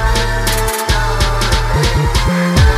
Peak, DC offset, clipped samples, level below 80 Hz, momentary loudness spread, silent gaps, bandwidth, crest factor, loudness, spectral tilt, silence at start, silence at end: 0 dBFS; under 0.1%; under 0.1%; -16 dBFS; 2 LU; none; 16 kHz; 12 dB; -14 LUFS; -4.5 dB/octave; 0 s; 0 s